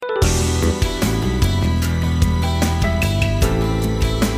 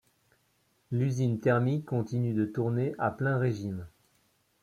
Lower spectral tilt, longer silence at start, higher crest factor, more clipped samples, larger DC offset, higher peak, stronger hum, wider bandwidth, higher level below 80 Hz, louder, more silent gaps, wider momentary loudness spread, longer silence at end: second, -5.5 dB/octave vs -8.5 dB/octave; second, 0 s vs 0.9 s; about the same, 16 dB vs 18 dB; neither; neither; first, 0 dBFS vs -14 dBFS; neither; first, 16 kHz vs 9.4 kHz; first, -22 dBFS vs -66 dBFS; first, -19 LUFS vs -30 LUFS; neither; second, 2 LU vs 9 LU; second, 0 s vs 0.75 s